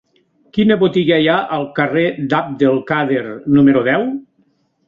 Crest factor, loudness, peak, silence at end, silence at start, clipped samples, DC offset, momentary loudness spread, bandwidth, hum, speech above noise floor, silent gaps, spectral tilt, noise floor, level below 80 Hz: 14 dB; -15 LUFS; -2 dBFS; 0.65 s; 0.55 s; under 0.1%; under 0.1%; 8 LU; 5.2 kHz; none; 45 dB; none; -8.5 dB/octave; -60 dBFS; -54 dBFS